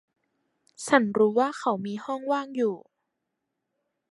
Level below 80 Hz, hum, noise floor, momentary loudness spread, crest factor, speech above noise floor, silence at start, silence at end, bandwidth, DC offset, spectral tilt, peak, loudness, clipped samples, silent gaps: -76 dBFS; none; -82 dBFS; 10 LU; 24 dB; 57 dB; 0.8 s; 1.35 s; 11.5 kHz; under 0.1%; -5 dB/octave; -4 dBFS; -26 LUFS; under 0.1%; none